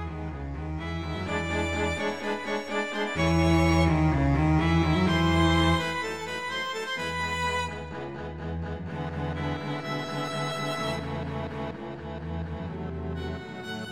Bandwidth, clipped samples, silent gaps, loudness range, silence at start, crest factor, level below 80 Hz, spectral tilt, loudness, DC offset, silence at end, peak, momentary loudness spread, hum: 14 kHz; under 0.1%; none; 9 LU; 0 s; 18 dB; -38 dBFS; -6 dB/octave; -28 LUFS; 0.2%; 0 s; -10 dBFS; 13 LU; none